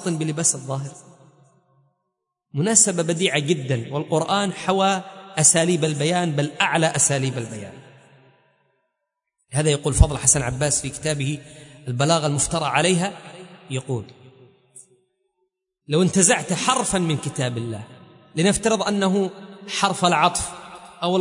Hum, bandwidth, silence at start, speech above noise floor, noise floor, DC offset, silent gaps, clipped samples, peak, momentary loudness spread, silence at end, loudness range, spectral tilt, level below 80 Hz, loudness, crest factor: none; 11 kHz; 0 s; 59 dB; -80 dBFS; under 0.1%; none; under 0.1%; 0 dBFS; 15 LU; 0 s; 5 LU; -3.5 dB/octave; -38 dBFS; -20 LUFS; 22 dB